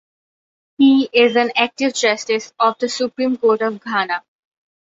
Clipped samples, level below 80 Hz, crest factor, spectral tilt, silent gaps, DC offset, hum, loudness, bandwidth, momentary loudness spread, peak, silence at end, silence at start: under 0.1%; -68 dBFS; 18 dB; -3 dB/octave; none; under 0.1%; none; -17 LUFS; 7.8 kHz; 8 LU; 0 dBFS; 0.75 s; 0.8 s